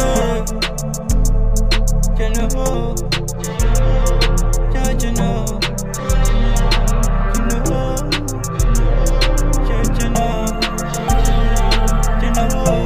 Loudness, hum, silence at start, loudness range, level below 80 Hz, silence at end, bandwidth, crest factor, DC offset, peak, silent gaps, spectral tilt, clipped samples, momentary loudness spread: -18 LUFS; none; 0 s; 1 LU; -16 dBFS; 0 s; 16 kHz; 14 dB; 4%; -2 dBFS; none; -4.5 dB/octave; under 0.1%; 4 LU